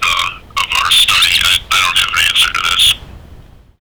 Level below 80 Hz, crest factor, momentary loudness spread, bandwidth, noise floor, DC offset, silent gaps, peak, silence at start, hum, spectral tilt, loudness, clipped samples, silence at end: -36 dBFS; 12 dB; 8 LU; over 20 kHz; -38 dBFS; under 0.1%; none; -2 dBFS; 0 s; none; 1 dB/octave; -10 LUFS; under 0.1%; 0.45 s